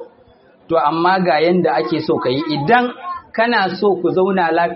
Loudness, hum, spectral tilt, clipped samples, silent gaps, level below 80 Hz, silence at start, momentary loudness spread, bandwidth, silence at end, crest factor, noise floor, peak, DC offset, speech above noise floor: -16 LUFS; none; -4 dB/octave; under 0.1%; none; -58 dBFS; 0 s; 5 LU; 5.8 kHz; 0 s; 16 dB; -49 dBFS; 0 dBFS; under 0.1%; 34 dB